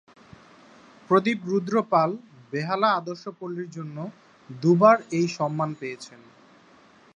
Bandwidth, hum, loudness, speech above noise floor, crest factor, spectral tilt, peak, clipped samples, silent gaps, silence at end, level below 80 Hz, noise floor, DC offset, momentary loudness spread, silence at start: 10 kHz; none; -24 LUFS; 31 dB; 22 dB; -6.5 dB/octave; -4 dBFS; under 0.1%; none; 1.1 s; -74 dBFS; -55 dBFS; under 0.1%; 19 LU; 1.1 s